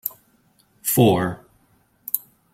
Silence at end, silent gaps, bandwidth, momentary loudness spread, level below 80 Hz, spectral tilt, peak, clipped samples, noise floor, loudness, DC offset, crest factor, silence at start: 0.35 s; none; 16.5 kHz; 19 LU; -56 dBFS; -5.5 dB/octave; -2 dBFS; under 0.1%; -61 dBFS; -21 LUFS; under 0.1%; 22 dB; 0.05 s